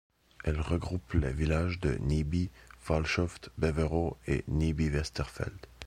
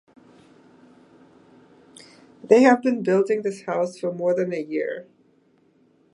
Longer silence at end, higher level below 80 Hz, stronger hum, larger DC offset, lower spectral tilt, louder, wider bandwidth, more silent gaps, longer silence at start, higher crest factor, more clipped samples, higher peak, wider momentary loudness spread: second, 0 s vs 1.1 s; first, -38 dBFS vs -76 dBFS; neither; neither; about the same, -6.5 dB/octave vs -6.5 dB/octave; second, -32 LUFS vs -21 LUFS; about the same, 11.5 kHz vs 11 kHz; neither; second, 0.45 s vs 2.45 s; about the same, 18 dB vs 22 dB; neither; second, -14 dBFS vs -4 dBFS; second, 7 LU vs 12 LU